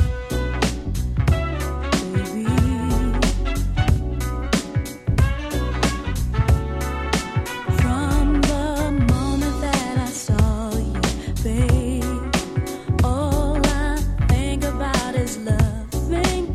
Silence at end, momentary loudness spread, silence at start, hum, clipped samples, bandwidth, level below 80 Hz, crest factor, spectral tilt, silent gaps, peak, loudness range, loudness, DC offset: 0 s; 6 LU; 0 s; none; under 0.1%; 15 kHz; -24 dBFS; 18 dB; -5.5 dB/octave; none; -2 dBFS; 2 LU; -22 LUFS; under 0.1%